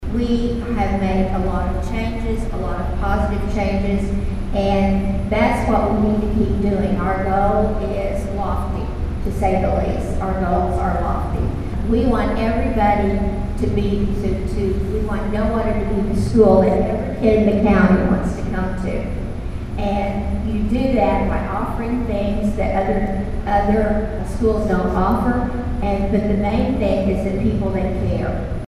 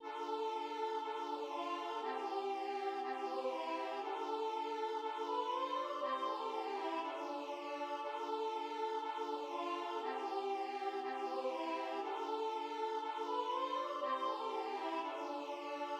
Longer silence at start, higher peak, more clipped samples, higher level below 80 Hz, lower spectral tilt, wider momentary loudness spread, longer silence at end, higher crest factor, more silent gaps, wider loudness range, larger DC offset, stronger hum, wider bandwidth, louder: about the same, 0 s vs 0 s; first, 0 dBFS vs -26 dBFS; neither; first, -24 dBFS vs under -90 dBFS; first, -8 dB/octave vs -1.5 dB/octave; first, 7 LU vs 3 LU; about the same, 0 s vs 0 s; about the same, 18 dB vs 14 dB; neither; first, 5 LU vs 1 LU; neither; neither; second, 12.5 kHz vs 14 kHz; first, -20 LUFS vs -41 LUFS